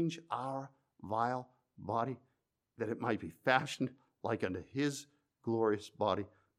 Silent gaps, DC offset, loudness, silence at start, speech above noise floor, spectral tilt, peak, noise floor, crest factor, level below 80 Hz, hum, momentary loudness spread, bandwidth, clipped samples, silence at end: none; under 0.1%; -37 LUFS; 0 s; 44 dB; -5.5 dB/octave; -14 dBFS; -80 dBFS; 24 dB; -76 dBFS; none; 14 LU; 15 kHz; under 0.1%; 0.3 s